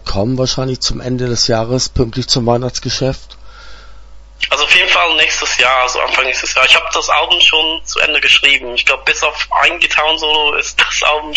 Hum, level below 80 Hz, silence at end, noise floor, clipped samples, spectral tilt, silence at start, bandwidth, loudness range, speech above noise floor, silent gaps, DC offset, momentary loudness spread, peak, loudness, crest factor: none; -34 dBFS; 0 s; -34 dBFS; 0.1%; -2.5 dB/octave; 0 s; 11 kHz; 6 LU; 20 dB; none; under 0.1%; 9 LU; 0 dBFS; -11 LUFS; 14 dB